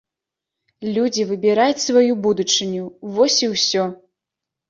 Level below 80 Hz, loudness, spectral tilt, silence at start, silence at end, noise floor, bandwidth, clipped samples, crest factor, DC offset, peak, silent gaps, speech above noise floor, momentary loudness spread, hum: -66 dBFS; -18 LUFS; -3 dB/octave; 0.8 s; 0.75 s; -85 dBFS; 7.6 kHz; under 0.1%; 18 dB; under 0.1%; -2 dBFS; none; 67 dB; 11 LU; none